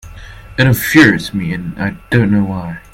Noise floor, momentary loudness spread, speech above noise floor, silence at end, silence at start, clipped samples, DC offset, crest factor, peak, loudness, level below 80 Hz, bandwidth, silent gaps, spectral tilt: -33 dBFS; 13 LU; 20 dB; 0.15 s; 0.05 s; 0.2%; under 0.1%; 14 dB; 0 dBFS; -13 LUFS; -38 dBFS; 17 kHz; none; -6 dB/octave